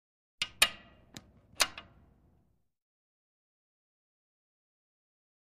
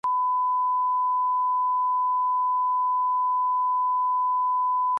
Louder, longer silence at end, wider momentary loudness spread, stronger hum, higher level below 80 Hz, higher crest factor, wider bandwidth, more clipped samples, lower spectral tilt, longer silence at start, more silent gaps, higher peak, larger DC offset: second, -30 LUFS vs -23 LUFS; first, 3.75 s vs 0 s; first, 25 LU vs 0 LU; second, none vs 50 Hz at -105 dBFS; first, -66 dBFS vs -84 dBFS; first, 34 dB vs 4 dB; first, 14.5 kHz vs 1.9 kHz; neither; second, 1 dB/octave vs -3 dB/octave; first, 0.4 s vs 0.05 s; neither; first, -6 dBFS vs -20 dBFS; neither